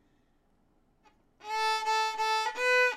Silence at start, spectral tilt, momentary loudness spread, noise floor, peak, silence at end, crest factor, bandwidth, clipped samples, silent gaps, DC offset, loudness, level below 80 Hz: 1.45 s; 1.5 dB/octave; 9 LU; -68 dBFS; -16 dBFS; 0 s; 16 dB; 16 kHz; under 0.1%; none; under 0.1%; -29 LUFS; -72 dBFS